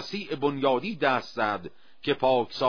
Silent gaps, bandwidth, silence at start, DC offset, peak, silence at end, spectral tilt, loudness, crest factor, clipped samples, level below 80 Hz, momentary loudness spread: none; 5.4 kHz; 0 s; 0.4%; -8 dBFS; 0 s; -6 dB/octave; -27 LUFS; 18 dB; under 0.1%; -62 dBFS; 10 LU